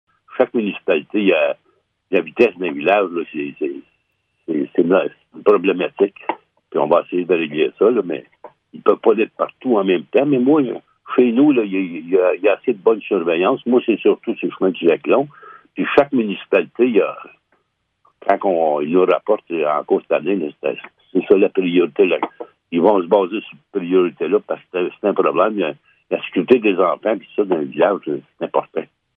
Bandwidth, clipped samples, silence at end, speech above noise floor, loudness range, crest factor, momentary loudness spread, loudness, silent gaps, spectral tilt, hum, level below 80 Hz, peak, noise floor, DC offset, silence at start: 4.3 kHz; under 0.1%; 0.35 s; 51 dB; 3 LU; 18 dB; 10 LU; -18 LUFS; none; -8.5 dB/octave; none; -68 dBFS; 0 dBFS; -68 dBFS; under 0.1%; 0.3 s